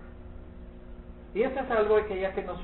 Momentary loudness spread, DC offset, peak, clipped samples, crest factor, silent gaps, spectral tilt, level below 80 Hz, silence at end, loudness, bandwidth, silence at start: 23 LU; under 0.1%; -14 dBFS; under 0.1%; 18 dB; none; -10 dB/octave; -46 dBFS; 0 s; -28 LUFS; 4.2 kHz; 0 s